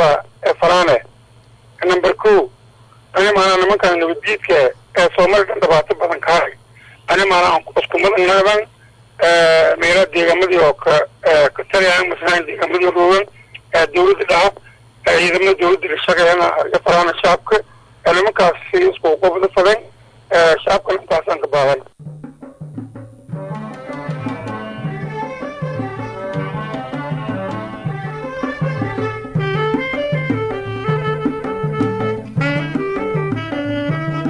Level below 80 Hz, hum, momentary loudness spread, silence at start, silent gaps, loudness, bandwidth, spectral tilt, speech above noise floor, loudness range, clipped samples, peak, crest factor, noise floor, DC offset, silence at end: -46 dBFS; none; 14 LU; 0 s; none; -15 LUFS; 10.5 kHz; -5 dB/octave; 33 dB; 11 LU; under 0.1%; -4 dBFS; 12 dB; -46 dBFS; under 0.1%; 0 s